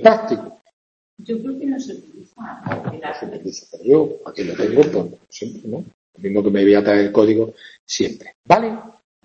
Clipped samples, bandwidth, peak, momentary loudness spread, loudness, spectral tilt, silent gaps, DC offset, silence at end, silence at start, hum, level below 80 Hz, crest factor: under 0.1%; 7.6 kHz; 0 dBFS; 18 LU; -19 LUFS; -5.5 dB/octave; 0.73-1.17 s, 5.94-6.13 s, 7.79-7.87 s, 8.35-8.44 s; under 0.1%; 0.35 s; 0 s; none; -58 dBFS; 18 dB